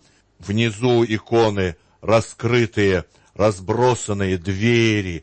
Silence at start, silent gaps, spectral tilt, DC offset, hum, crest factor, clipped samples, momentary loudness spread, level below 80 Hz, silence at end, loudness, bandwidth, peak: 0.4 s; none; -6 dB/octave; under 0.1%; none; 14 dB; under 0.1%; 7 LU; -48 dBFS; 0 s; -19 LUFS; 8.8 kHz; -4 dBFS